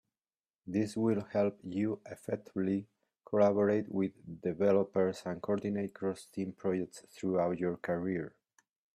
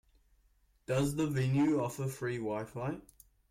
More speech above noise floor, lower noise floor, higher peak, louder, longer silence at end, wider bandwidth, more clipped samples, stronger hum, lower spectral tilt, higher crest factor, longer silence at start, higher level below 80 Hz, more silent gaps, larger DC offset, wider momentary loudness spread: first, over 57 dB vs 37 dB; first, under -90 dBFS vs -70 dBFS; first, -16 dBFS vs -22 dBFS; about the same, -34 LUFS vs -34 LUFS; first, 0.65 s vs 0.5 s; second, 13 kHz vs 16 kHz; neither; neither; about the same, -7.5 dB/octave vs -7 dB/octave; first, 18 dB vs 12 dB; second, 0.65 s vs 0.9 s; second, -72 dBFS vs -60 dBFS; neither; neither; about the same, 11 LU vs 10 LU